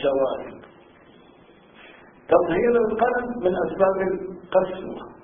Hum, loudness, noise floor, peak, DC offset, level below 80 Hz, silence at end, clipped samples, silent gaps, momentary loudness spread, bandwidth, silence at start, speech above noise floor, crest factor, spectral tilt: none; -23 LUFS; -51 dBFS; -4 dBFS; under 0.1%; -54 dBFS; 0.1 s; under 0.1%; none; 13 LU; 3.7 kHz; 0 s; 29 dB; 20 dB; -10.5 dB/octave